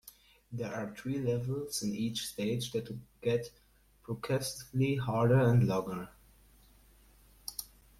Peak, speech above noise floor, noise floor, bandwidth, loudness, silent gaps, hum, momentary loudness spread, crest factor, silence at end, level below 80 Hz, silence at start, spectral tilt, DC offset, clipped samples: -16 dBFS; 29 dB; -61 dBFS; 16 kHz; -33 LUFS; none; none; 16 LU; 18 dB; 0.35 s; -60 dBFS; 0.05 s; -6 dB/octave; under 0.1%; under 0.1%